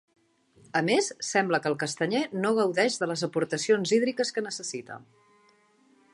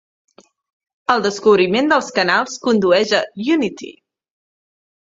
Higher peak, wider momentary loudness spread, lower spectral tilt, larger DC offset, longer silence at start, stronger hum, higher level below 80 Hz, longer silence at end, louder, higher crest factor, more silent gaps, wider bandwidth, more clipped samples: second, -10 dBFS vs 0 dBFS; about the same, 10 LU vs 10 LU; about the same, -4 dB/octave vs -4 dB/octave; neither; second, 0.75 s vs 1.1 s; neither; second, -76 dBFS vs -60 dBFS; about the same, 1.15 s vs 1.2 s; second, -27 LUFS vs -16 LUFS; about the same, 18 dB vs 18 dB; neither; first, 11.5 kHz vs 7.8 kHz; neither